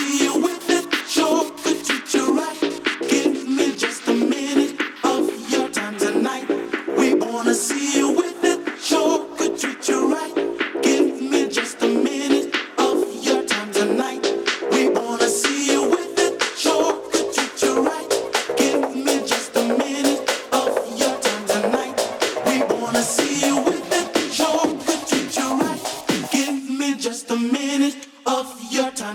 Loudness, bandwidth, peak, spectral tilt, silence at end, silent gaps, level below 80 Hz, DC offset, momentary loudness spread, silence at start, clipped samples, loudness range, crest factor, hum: -20 LUFS; 18.5 kHz; -6 dBFS; -2.5 dB/octave; 0 s; none; -64 dBFS; under 0.1%; 5 LU; 0 s; under 0.1%; 2 LU; 14 dB; none